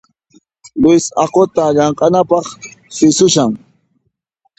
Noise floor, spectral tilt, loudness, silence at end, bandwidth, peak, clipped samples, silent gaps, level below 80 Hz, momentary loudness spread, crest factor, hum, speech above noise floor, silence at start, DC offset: -65 dBFS; -4.5 dB/octave; -12 LUFS; 1 s; 8.8 kHz; 0 dBFS; under 0.1%; none; -50 dBFS; 17 LU; 14 dB; none; 54 dB; 0.75 s; under 0.1%